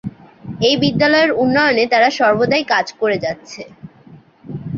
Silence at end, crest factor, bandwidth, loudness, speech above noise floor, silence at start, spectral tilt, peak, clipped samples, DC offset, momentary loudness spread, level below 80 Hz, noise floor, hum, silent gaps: 0 s; 14 dB; 7.6 kHz; -15 LUFS; 29 dB; 0.05 s; -5 dB/octave; -2 dBFS; under 0.1%; under 0.1%; 20 LU; -52 dBFS; -44 dBFS; none; none